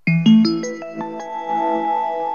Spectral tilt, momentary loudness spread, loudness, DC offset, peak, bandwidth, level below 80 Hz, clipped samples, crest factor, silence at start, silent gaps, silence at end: -6.5 dB/octave; 15 LU; -19 LUFS; 0.3%; -2 dBFS; 6.8 kHz; -78 dBFS; under 0.1%; 16 dB; 0.05 s; none; 0 s